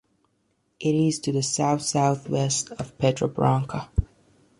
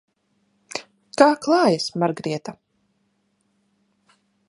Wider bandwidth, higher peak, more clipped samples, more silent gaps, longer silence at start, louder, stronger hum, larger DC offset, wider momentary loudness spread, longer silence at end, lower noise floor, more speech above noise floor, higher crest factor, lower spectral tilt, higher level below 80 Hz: about the same, 11.5 kHz vs 11.5 kHz; second, -6 dBFS vs 0 dBFS; neither; neither; about the same, 0.8 s vs 0.75 s; second, -24 LUFS vs -21 LUFS; neither; neither; second, 7 LU vs 17 LU; second, 0.55 s vs 1.95 s; about the same, -70 dBFS vs -69 dBFS; about the same, 47 dB vs 49 dB; about the same, 20 dB vs 24 dB; about the same, -5 dB/octave vs -5 dB/octave; first, -40 dBFS vs -70 dBFS